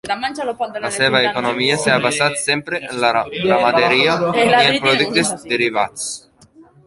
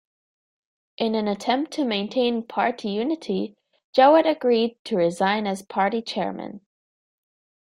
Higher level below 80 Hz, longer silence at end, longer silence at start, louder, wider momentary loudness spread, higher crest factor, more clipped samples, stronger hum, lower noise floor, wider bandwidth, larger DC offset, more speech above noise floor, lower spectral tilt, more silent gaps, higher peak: first, -54 dBFS vs -70 dBFS; second, 0.25 s vs 1.1 s; second, 0.05 s vs 1 s; first, -16 LUFS vs -23 LUFS; about the same, 10 LU vs 11 LU; about the same, 16 dB vs 20 dB; neither; neither; second, -47 dBFS vs under -90 dBFS; second, 11.5 kHz vs 14 kHz; neither; second, 30 dB vs over 68 dB; second, -3 dB/octave vs -5.5 dB/octave; second, none vs 3.84-3.93 s, 4.79-4.85 s; first, 0 dBFS vs -4 dBFS